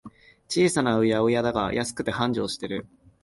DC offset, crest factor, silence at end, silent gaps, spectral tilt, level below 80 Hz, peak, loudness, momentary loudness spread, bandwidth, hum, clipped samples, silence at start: under 0.1%; 18 dB; 0.4 s; none; -5 dB/octave; -52 dBFS; -8 dBFS; -25 LUFS; 9 LU; 11.5 kHz; none; under 0.1%; 0.05 s